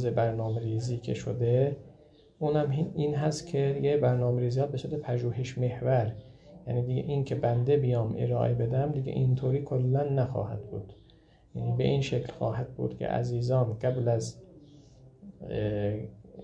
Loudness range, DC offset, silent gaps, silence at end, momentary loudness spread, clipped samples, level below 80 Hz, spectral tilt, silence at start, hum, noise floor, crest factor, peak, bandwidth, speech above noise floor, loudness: 3 LU; under 0.1%; none; 0 s; 10 LU; under 0.1%; -56 dBFS; -8 dB/octave; 0 s; none; -59 dBFS; 16 dB; -14 dBFS; 8.8 kHz; 30 dB; -29 LUFS